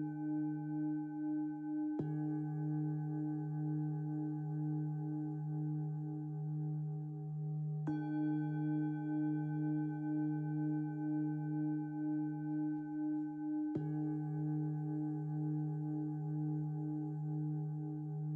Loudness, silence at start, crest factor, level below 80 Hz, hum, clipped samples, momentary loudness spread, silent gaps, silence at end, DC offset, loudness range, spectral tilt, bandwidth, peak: -40 LUFS; 0 s; 12 dB; -80 dBFS; none; under 0.1%; 3 LU; none; 0 s; under 0.1%; 2 LU; -12 dB/octave; 2.5 kHz; -26 dBFS